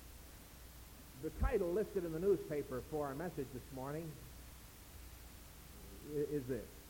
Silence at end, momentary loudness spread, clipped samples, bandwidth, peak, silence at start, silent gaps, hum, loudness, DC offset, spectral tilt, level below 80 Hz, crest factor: 0 s; 19 LU; under 0.1%; 17 kHz; -24 dBFS; 0 s; none; none; -41 LUFS; under 0.1%; -6.5 dB/octave; -52 dBFS; 20 dB